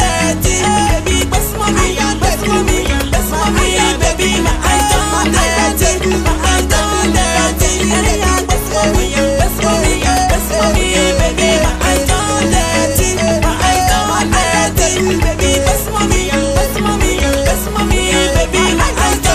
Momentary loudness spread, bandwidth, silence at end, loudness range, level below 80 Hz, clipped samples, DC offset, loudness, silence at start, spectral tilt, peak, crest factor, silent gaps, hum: 2 LU; 16 kHz; 0 s; 1 LU; -18 dBFS; under 0.1%; under 0.1%; -13 LUFS; 0 s; -3.5 dB/octave; 0 dBFS; 12 dB; none; none